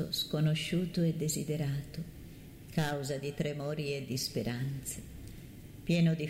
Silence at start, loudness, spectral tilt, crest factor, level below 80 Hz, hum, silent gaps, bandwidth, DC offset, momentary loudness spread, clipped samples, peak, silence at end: 0 s; -34 LUFS; -5.5 dB/octave; 16 dB; -56 dBFS; none; none; 16 kHz; under 0.1%; 18 LU; under 0.1%; -18 dBFS; 0 s